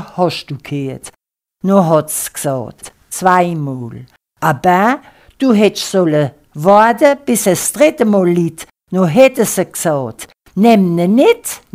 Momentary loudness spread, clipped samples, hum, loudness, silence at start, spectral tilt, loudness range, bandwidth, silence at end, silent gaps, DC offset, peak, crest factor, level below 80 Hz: 14 LU; 0.1%; none; -13 LUFS; 0 s; -5 dB/octave; 4 LU; 16.5 kHz; 0.15 s; none; under 0.1%; 0 dBFS; 14 dB; -54 dBFS